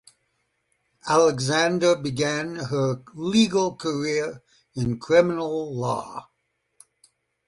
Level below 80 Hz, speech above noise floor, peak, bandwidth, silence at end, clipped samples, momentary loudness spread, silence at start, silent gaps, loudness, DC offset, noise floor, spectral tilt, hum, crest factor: -58 dBFS; 50 dB; -6 dBFS; 11.5 kHz; 1.25 s; under 0.1%; 11 LU; 1.05 s; none; -23 LUFS; under 0.1%; -73 dBFS; -5 dB/octave; none; 18 dB